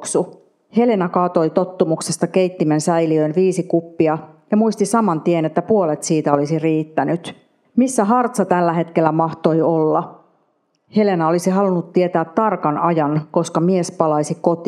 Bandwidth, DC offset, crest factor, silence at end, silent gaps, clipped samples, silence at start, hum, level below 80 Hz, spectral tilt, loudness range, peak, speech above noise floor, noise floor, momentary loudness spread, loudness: 13.5 kHz; under 0.1%; 18 dB; 0 s; none; under 0.1%; 0 s; none; -74 dBFS; -6.5 dB/octave; 1 LU; 0 dBFS; 48 dB; -64 dBFS; 4 LU; -18 LUFS